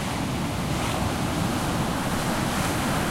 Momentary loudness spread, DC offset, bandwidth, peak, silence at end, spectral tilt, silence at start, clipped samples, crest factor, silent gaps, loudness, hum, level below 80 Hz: 3 LU; under 0.1%; 16 kHz; -12 dBFS; 0 s; -4.5 dB/octave; 0 s; under 0.1%; 14 dB; none; -26 LUFS; none; -38 dBFS